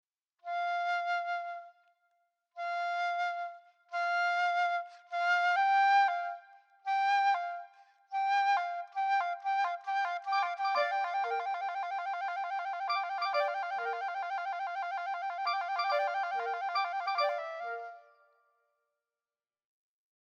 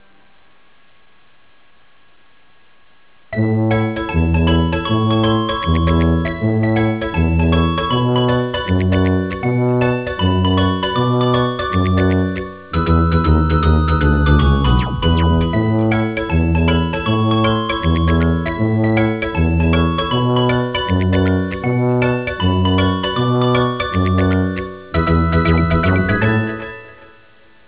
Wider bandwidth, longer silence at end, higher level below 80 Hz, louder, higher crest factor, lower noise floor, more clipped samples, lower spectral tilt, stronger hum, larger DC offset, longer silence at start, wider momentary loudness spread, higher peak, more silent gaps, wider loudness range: first, 7.6 kHz vs 4 kHz; first, 2.2 s vs 0.75 s; second, under -90 dBFS vs -24 dBFS; second, -32 LUFS vs -16 LUFS; about the same, 16 dB vs 14 dB; first, under -90 dBFS vs -54 dBFS; neither; second, 2.5 dB/octave vs -11 dB/octave; neither; second, under 0.1% vs 0.4%; second, 0.45 s vs 3.3 s; first, 12 LU vs 4 LU; second, -18 dBFS vs -2 dBFS; neither; first, 6 LU vs 2 LU